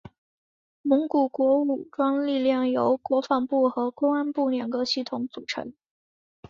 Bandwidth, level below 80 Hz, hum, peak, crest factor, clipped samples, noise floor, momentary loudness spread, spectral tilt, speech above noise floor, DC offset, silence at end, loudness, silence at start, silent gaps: 7.4 kHz; -68 dBFS; none; -8 dBFS; 16 dB; under 0.1%; under -90 dBFS; 10 LU; -5 dB/octave; over 66 dB; under 0.1%; 0.8 s; -25 LUFS; 0.85 s; none